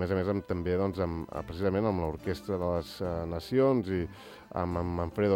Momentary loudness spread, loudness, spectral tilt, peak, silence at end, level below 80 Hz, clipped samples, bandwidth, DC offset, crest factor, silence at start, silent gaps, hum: 9 LU; -31 LUFS; -8 dB/octave; -14 dBFS; 0 s; -52 dBFS; under 0.1%; 16.5 kHz; under 0.1%; 16 dB; 0 s; none; none